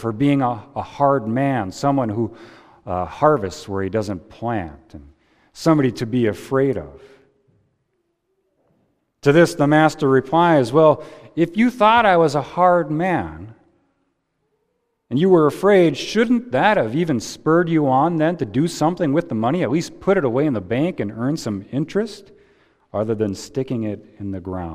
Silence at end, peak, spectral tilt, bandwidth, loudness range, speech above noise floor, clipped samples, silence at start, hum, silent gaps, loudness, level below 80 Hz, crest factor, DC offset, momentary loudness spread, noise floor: 0 s; 0 dBFS; -6.5 dB/octave; 15 kHz; 8 LU; 52 dB; under 0.1%; 0 s; none; none; -19 LUFS; -52 dBFS; 20 dB; under 0.1%; 13 LU; -71 dBFS